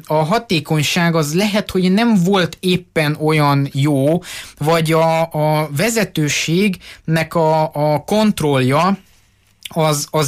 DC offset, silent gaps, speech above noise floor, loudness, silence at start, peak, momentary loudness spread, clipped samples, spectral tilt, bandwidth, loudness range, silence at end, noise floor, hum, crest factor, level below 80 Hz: under 0.1%; none; 38 dB; -16 LUFS; 0.1 s; -4 dBFS; 5 LU; under 0.1%; -5.5 dB/octave; 15.5 kHz; 1 LU; 0 s; -54 dBFS; none; 12 dB; -48 dBFS